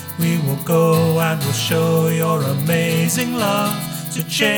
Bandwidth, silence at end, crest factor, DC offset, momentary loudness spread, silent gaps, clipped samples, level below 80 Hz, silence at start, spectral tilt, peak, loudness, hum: over 20 kHz; 0 s; 14 dB; under 0.1%; 6 LU; none; under 0.1%; -56 dBFS; 0 s; -5 dB/octave; -4 dBFS; -18 LUFS; none